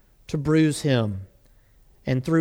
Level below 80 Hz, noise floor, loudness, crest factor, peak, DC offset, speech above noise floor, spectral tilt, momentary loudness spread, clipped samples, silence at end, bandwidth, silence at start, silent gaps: -50 dBFS; -56 dBFS; -23 LUFS; 16 dB; -8 dBFS; under 0.1%; 34 dB; -6.5 dB/octave; 14 LU; under 0.1%; 0 s; 15 kHz; 0.3 s; none